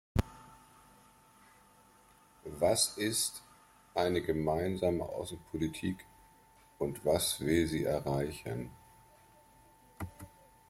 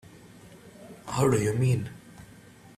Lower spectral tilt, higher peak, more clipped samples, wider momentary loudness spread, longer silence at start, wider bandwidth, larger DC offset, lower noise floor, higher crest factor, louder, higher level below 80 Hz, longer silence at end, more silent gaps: second, -4.5 dB/octave vs -6.5 dB/octave; second, -14 dBFS vs -10 dBFS; neither; second, 18 LU vs 25 LU; about the same, 0.15 s vs 0.05 s; first, 16.5 kHz vs 14.5 kHz; neither; first, -63 dBFS vs -51 dBFS; about the same, 22 dB vs 20 dB; second, -33 LUFS vs -26 LUFS; about the same, -54 dBFS vs -56 dBFS; second, 0.4 s vs 0.55 s; neither